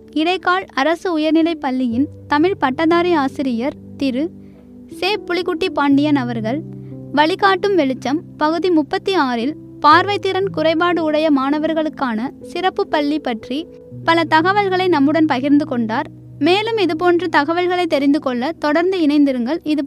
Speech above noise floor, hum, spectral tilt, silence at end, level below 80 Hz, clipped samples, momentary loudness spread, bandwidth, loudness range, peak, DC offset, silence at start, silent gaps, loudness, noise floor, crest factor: 23 dB; none; -6 dB/octave; 0 s; -54 dBFS; under 0.1%; 9 LU; 12 kHz; 3 LU; 0 dBFS; under 0.1%; 0.1 s; none; -17 LUFS; -39 dBFS; 16 dB